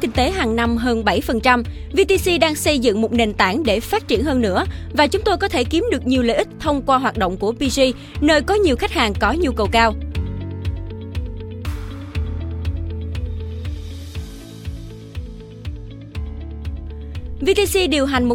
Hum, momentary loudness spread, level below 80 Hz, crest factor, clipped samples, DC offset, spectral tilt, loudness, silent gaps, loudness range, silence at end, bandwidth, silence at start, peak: none; 16 LU; -32 dBFS; 18 dB; under 0.1%; under 0.1%; -5 dB/octave; -19 LUFS; none; 13 LU; 0 s; 17 kHz; 0 s; 0 dBFS